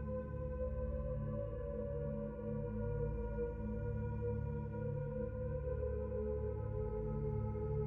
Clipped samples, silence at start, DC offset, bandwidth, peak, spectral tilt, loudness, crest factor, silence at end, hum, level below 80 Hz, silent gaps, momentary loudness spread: under 0.1%; 0 s; under 0.1%; 3 kHz; -28 dBFS; -11.5 dB/octave; -42 LUFS; 12 dB; 0 s; none; -46 dBFS; none; 2 LU